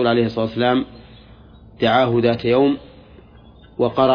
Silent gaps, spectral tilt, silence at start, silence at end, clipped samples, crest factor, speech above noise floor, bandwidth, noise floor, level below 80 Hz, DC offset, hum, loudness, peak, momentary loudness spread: none; -8.5 dB/octave; 0 s; 0 s; under 0.1%; 18 dB; 28 dB; 5.2 kHz; -45 dBFS; -48 dBFS; under 0.1%; none; -18 LUFS; -2 dBFS; 9 LU